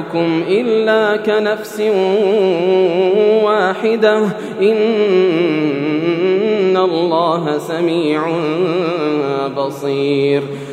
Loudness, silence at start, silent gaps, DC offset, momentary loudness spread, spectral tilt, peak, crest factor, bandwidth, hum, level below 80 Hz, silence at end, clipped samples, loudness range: -15 LUFS; 0 s; none; under 0.1%; 5 LU; -6.5 dB/octave; 0 dBFS; 14 dB; 14 kHz; none; -68 dBFS; 0 s; under 0.1%; 3 LU